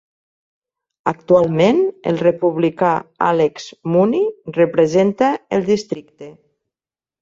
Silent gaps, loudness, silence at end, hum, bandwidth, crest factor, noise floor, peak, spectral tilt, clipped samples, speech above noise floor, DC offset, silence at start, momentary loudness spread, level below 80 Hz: none; -17 LUFS; 0.9 s; none; 7.6 kHz; 16 dB; under -90 dBFS; -2 dBFS; -7 dB/octave; under 0.1%; over 74 dB; under 0.1%; 1.05 s; 9 LU; -58 dBFS